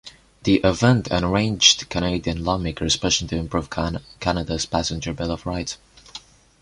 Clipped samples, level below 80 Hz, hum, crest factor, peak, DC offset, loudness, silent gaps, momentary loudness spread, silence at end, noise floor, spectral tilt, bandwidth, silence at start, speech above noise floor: under 0.1%; -38 dBFS; none; 22 dB; 0 dBFS; under 0.1%; -21 LUFS; none; 14 LU; 0.4 s; -44 dBFS; -4 dB/octave; 11.5 kHz; 0.05 s; 22 dB